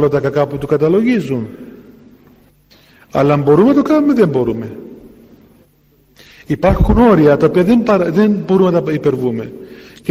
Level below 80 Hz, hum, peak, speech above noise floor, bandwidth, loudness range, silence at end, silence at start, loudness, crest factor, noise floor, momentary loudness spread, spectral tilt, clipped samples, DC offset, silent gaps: -30 dBFS; none; 0 dBFS; 40 dB; 15.5 kHz; 5 LU; 0 s; 0 s; -13 LUFS; 14 dB; -52 dBFS; 15 LU; -8.5 dB/octave; under 0.1%; under 0.1%; none